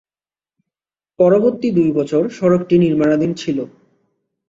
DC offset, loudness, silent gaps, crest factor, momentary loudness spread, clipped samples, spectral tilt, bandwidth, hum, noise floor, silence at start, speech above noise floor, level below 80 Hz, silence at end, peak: under 0.1%; -16 LUFS; none; 16 dB; 9 LU; under 0.1%; -8 dB/octave; 7.8 kHz; none; under -90 dBFS; 1.2 s; over 75 dB; -56 dBFS; 0.85 s; -2 dBFS